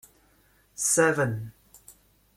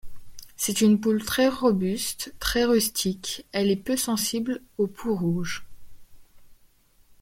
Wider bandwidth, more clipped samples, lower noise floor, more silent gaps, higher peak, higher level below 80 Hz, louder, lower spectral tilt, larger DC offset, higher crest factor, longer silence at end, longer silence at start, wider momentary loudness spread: about the same, 16.5 kHz vs 16.5 kHz; neither; first, -63 dBFS vs -59 dBFS; neither; about the same, -8 dBFS vs -10 dBFS; second, -62 dBFS vs -48 dBFS; about the same, -24 LUFS vs -25 LUFS; about the same, -4 dB/octave vs -4 dB/octave; neither; first, 22 dB vs 16 dB; second, 0.45 s vs 0.7 s; first, 0.8 s vs 0.05 s; first, 22 LU vs 9 LU